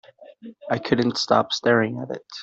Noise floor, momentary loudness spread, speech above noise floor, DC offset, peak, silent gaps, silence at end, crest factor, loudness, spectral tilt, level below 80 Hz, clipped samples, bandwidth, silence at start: -44 dBFS; 13 LU; 22 dB; under 0.1%; -4 dBFS; none; 0 s; 20 dB; -22 LUFS; -5 dB/octave; -62 dBFS; under 0.1%; 8 kHz; 0.2 s